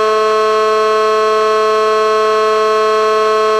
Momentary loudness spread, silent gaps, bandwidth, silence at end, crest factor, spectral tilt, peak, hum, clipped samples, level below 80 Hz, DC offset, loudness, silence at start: 0 LU; none; 12.5 kHz; 0 s; 8 dB; -2 dB/octave; -2 dBFS; none; under 0.1%; -62 dBFS; under 0.1%; -12 LUFS; 0 s